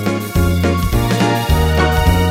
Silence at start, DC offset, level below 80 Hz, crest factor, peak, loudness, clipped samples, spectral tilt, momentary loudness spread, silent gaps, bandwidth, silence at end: 0 s; under 0.1%; -20 dBFS; 12 dB; -2 dBFS; -15 LUFS; under 0.1%; -6 dB/octave; 3 LU; none; 16.5 kHz; 0 s